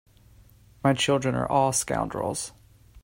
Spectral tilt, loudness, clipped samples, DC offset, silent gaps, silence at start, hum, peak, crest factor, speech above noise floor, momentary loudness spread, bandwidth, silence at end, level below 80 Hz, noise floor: -4 dB/octave; -25 LUFS; under 0.1%; under 0.1%; none; 0.85 s; none; -8 dBFS; 20 dB; 30 dB; 8 LU; 16 kHz; 0.05 s; -52 dBFS; -54 dBFS